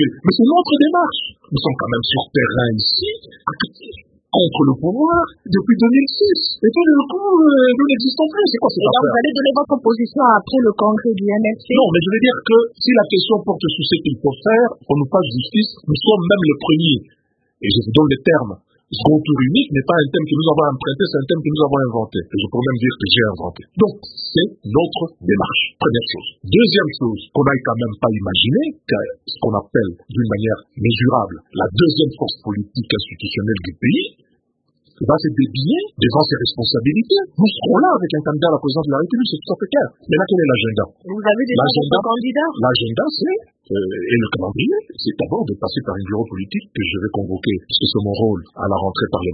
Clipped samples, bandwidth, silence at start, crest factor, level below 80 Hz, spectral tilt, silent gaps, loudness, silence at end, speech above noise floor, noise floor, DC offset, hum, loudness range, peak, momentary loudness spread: under 0.1%; 5 kHz; 0 s; 16 dB; -48 dBFS; -10 dB/octave; none; -17 LUFS; 0 s; 50 dB; -66 dBFS; under 0.1%; none; 6 LU; 0 dBFS; 9 LU